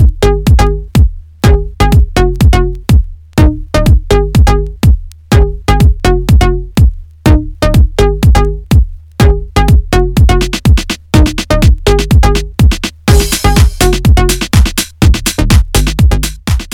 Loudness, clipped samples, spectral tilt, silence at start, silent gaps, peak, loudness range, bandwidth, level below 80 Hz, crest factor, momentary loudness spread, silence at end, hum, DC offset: -10 LUFS; 0.3%; -5.5 dB/octave; 0 s; none; 0 dBFS; 1 LU; 17.5 kHz; -10 dBFS; 8 dB; 3 LU; 0 s; none; under 0.1%